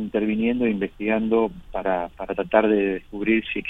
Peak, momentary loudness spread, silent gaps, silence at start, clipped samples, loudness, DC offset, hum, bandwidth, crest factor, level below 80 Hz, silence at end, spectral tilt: -4 dBFS; 7 LU; none; 0 s; under 0.1%; -23 LUFS; under 0.1%; none; 3.9 kHz; 20 dB; -48 dBFS; 0 s; -8.5 dB/octave